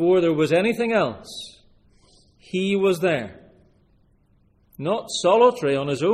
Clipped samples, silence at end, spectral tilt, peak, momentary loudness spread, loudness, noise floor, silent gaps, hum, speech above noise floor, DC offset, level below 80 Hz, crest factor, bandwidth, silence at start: under 0.1%; 0 s; -5.5 dB/octave; -4 dBFS; 18 LU; -21 LUFS; -60 dBFS; none; none; 40 dB; under 0.1%; -60 dBFS; 18 dB; 15 kHz; 0 s